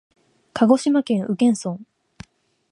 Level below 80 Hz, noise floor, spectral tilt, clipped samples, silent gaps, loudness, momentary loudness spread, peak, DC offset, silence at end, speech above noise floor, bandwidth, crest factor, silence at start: -60 dBFS; -55 dBFS; -6 dB/octave; under 0.1%; none; -20 LUFS; 16 LU; -2 dBFS; under 0.1%; 0.9 s; 36 dB; 11.5 kHz; 20 dB; 0.55 s